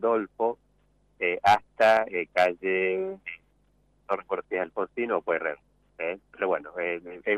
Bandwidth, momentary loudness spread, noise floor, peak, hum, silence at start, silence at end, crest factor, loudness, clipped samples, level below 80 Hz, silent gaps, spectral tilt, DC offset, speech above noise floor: 14.5 kHz; 13 LU; -66 dBFS; -12 dBFS; 50 Hz at -65 dBFS; 0 s; 0 s; 16 dB; -27 LUFS; under 0.1%; -66 dBFS; none; -5 dB/octave; under 0.1%; 39 dB